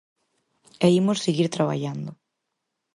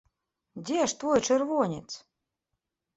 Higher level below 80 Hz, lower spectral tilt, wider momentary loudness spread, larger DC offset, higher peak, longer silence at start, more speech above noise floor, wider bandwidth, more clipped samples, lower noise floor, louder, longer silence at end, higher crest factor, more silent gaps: about the same, -68 dBFS vs -66 dBFS; first, -6 dB/octave vs -4 dB/octave; second, 14 LU vs 18 LU; neither; about the same, -8 dBFS vs -10 dBFS; first, 0.8 s vs 0.55 s; about the same, 58 dB vs 57 dB; first, 11.5 kHz vs 8.2 kHz; neither; second, -80 dBFS vs -84 dBFS; first, -23 LUFS vs -27 LUFS; second, 0.8 s vs 1 s; about the same, 18 dB vs 20 dB; neither